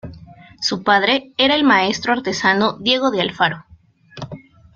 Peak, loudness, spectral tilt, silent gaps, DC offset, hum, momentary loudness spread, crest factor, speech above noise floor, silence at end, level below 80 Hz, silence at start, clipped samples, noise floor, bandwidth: -2 dBFS; -17 LUFS; -3.5 dB/octave; none; under 0.1%; none; 19 LU; 18 dB; 28 dB; 0.4 s; -54 dBFS; 0.05 s; under 0.1%; -45 dBFS; 7.6 kHz